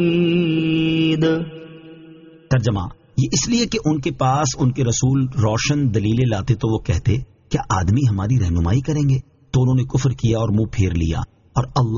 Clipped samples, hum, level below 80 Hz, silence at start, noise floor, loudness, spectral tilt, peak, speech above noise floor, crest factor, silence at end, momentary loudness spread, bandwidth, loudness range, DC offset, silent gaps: under 0.1%; none; -36 dBFS; 0 s; -43 dBFS; -19 LUFS; -6.5 dB/octave; -4 dBFS; 25 dB; 14 dB; 0 s; 7 LU; 7.4 kHz; 2 LU; under 0.1%; none